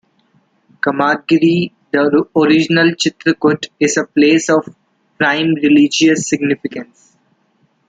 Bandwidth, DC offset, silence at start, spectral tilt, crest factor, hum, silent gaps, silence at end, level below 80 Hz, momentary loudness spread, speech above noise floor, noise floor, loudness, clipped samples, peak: 9.2 kHz; under 0.1%; 0.85 s; -4.5 dB/octave; 14 dB; none; none; 1.05 s; -60 dBFS; 7 LU; 46 dB; -59 dBFS; -14 LUFS; under 0.1%; -2 dBFS